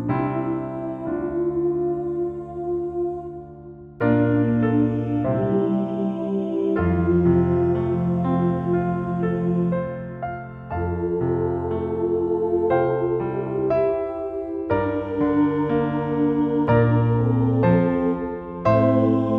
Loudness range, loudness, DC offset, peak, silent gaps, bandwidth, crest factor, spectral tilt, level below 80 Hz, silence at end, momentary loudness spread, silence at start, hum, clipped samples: 5 LU; -22 LUFS; under 0.1%; -6 dBFS; none; 5 kHz; 14 dB; -11 dB/octave; -44 dBFS; 0 s; 10 LU; 0 s; none; under 0.1%